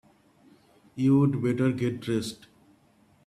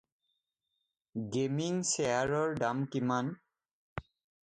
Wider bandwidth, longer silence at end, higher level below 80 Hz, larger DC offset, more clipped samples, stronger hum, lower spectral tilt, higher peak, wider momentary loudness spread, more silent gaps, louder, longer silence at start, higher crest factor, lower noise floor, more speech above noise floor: first, 13.5 kHz vs 9.6 kHz; first, 0.9 s vs 0.5 s; about the same, -64 dBFS vs -64 dBFS; neither; neither; neither; first, -7.5 dB/octave vs -4.5 dB/octave; first, -12 dBFS vs -16 dBFS; about the same, 18 LU vs 16 LU; second, none vs 3.73-3.96 s; first, -26 LUFS vs -33 LUFS; second, 0.95 s vs 1.15 s; about the same, 16 dB vs 18 dB; second, -62 dBFS vs -85 dBFS; second, 37 dB vs 53 dB